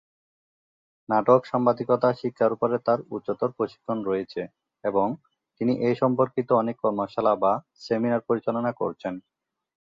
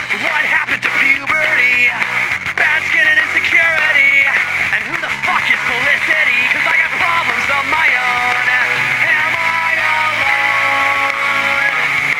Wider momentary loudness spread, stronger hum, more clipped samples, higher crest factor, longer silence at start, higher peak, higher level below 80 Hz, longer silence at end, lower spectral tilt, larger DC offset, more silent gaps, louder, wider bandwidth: first, 10 LU vs 4 LU; neither; neither; first, 20 dB vs 14 dB; first, 1.1 s vs 0 s; second, -4 dBFS vs 0 dBFS; second, -68 dBFS vs -52 dBFS; first, 0.7 s vs 0 s; first, -8.5 dB/octave vs -2 dB/octave; neither; neither; second, -25 LUFS vs -12 LUFS; second, 7.2 kHz vs 17 kHz